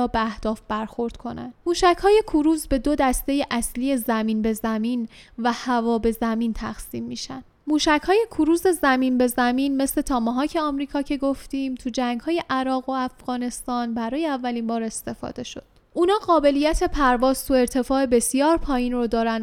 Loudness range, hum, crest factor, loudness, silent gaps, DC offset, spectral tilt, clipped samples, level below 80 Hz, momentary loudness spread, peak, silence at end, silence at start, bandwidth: 5 LU; none; 16 dB; -22 LUFS; none; under 0.1%; -4 dB/octave; under 0.1%; -40 dBFS; 12 LU; -6 dBFS; 0 s; 0 s; 17.5 kHz